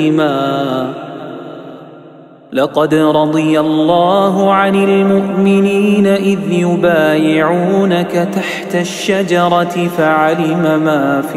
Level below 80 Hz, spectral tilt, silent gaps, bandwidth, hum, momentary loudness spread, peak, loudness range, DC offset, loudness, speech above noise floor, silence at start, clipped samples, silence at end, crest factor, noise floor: -54 dBFS; -6.5 dB/octave; none; 15 kHz; none; 8 LU; 0 dBFS; 4 LU; under 0.1%; -12 LUFS; 26 dB; 0 s; under 0.1%; 0 s; 12 dB; -37 dBFS